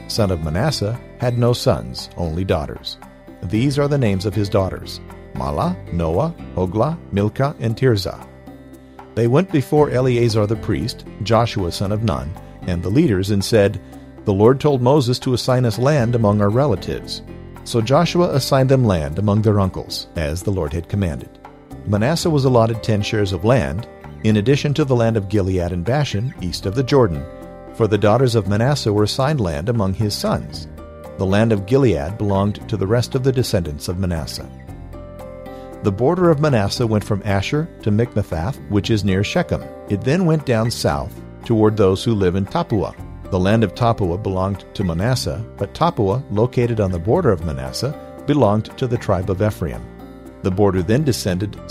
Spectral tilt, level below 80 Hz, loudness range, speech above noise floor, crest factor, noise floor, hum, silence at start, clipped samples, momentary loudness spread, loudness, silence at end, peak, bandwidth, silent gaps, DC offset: -6.5 dB/octave; -38 dBFS; 4 LU; 22 dB; 18 dB; -40 dBFS; none; 0 s; under 0.1%; 14 LU; -19 LUFS; 0 s; 0 dBFS; 15 kHz; none; under 0.1%